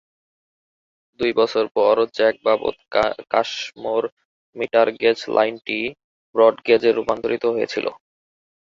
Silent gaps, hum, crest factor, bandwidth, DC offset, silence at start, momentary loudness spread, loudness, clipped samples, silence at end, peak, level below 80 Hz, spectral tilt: 1.71-1.75 s, 4.12-4.17 s, 4.25-4.53 s, 6.04-6.33 s; none; 20 dB; 7.6 kHz; under 0.1%; 1.2 s; 9 LU; -20 LUFS; under 0.1%; 0.8 s; -2 dBFS; -60 dBFS; -4.5 dB/octave